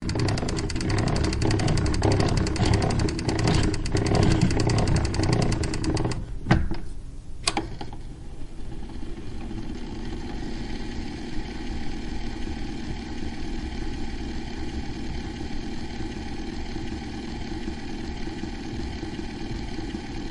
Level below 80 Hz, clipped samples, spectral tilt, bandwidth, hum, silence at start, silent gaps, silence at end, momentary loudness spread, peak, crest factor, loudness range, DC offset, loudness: -32 dBFS; under 0.1%; -5.5 dB/octave; 11.5 kHz; none; 0 s; none; 0 s; 13 LU; -4 dBFS; 22 dB; 11 LU; under 0.1%; -28 LUFS